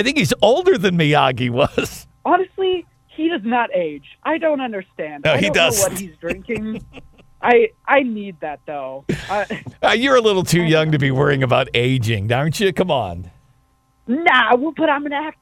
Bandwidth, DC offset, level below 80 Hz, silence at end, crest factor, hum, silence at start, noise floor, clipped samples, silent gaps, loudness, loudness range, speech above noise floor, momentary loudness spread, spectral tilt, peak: 16 kHz; under 0.1%; -46 dBFS; 0.1 s; 18 dB; none; 0 s; -59 dBFS; under 0.1%; none; -18 LUFS; 4 LU; 41 dB; 13 LU; -4.5 dB/octave; 0 dBFS